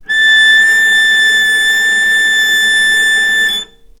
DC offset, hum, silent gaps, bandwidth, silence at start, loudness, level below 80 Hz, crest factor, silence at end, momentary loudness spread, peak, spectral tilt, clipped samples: under 0.1%; none; none; 19 kHz; 0.1 s; -8 LUFS; -46 dBFS; 10 dB; 0.35 s; 4 LU; 0 dBFS; 2 dB/octave; under 0.1%